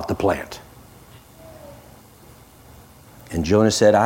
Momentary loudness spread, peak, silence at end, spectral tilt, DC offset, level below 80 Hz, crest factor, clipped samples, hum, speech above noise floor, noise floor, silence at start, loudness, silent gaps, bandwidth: 28 LU; -4 dBFS; 0 s; -5 dB/octave; under 0.1%; -48 dBFS; 18 dB; under 0.1%; none; 30 dB; -47 dBFS; 0 s; -19 LUFS; none; 16.5 kHz